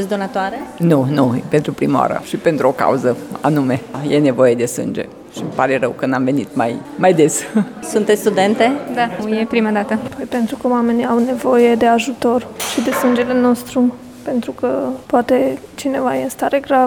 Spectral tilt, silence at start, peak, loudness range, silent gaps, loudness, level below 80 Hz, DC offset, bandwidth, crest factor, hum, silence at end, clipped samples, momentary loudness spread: -5.5 dB/octave; 0 s; 0 dBFS; 2 LU; none; -16 LUFS; -54 dBFS; under 0.1%; 18.5 kHz; 16 dB; none; 0 s; under 0.1%; 8 LU